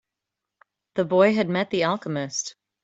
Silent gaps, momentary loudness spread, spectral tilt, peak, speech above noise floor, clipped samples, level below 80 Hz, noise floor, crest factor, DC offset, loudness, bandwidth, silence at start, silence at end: none; 11 LU; -4.5 dB/octave; -6 dBFS; 63 dB; under 0.1%; -68 dBFS; -85 dBFS; 20 dB; under 0.1%; -23 LUFS; 8 kHz; 0.95 s; 0.35 s